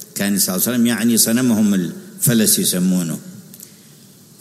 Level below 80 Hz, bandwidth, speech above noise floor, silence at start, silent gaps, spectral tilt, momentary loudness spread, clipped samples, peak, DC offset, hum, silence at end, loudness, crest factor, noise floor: -66 dBFS; 16 kHz; 29 dB; 0 s; none; -3.5 dB/octave; 11 LU; under 0.1%; -2 dBFS; under 0.1%; none; 0.75 s; -16 LUFS; 16 dB; -45 dBFS